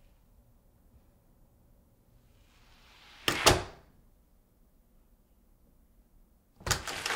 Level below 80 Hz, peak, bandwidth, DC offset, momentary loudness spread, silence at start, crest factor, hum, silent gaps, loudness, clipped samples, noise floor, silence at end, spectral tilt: -52 dBFS; -8 dBFS; 16 kHz; under 0.1%; 21 LU; 3.2 s; 30 dB; none; none; -28 LUFS; under 0.1%; -64 dBFS; 0 s; -2.5 dB/octave